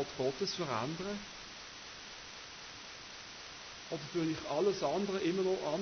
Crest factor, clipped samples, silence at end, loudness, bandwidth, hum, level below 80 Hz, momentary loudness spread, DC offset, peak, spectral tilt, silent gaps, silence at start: 16 dB; under 0.1%; 0 s; -38 LUFS; 6.6 kHz; none; -68 dBFS; 13 LU; under 0.1%; -22 dBFS; -4.5 dB/octave; none; 0 s